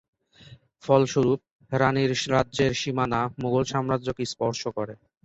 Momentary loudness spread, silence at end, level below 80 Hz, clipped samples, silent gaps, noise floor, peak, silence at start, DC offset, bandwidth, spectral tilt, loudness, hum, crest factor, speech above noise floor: 9 LU; 0.3 s; -54 dBFS; under 0.1%; 1.51-1.59 s; -51 dBFS; -6 dBFS; 0.5 s; under 0.1%; 8.2 kHz; -5.5 dB/octave; -25 LUFS; none; 20 dB; 27 dB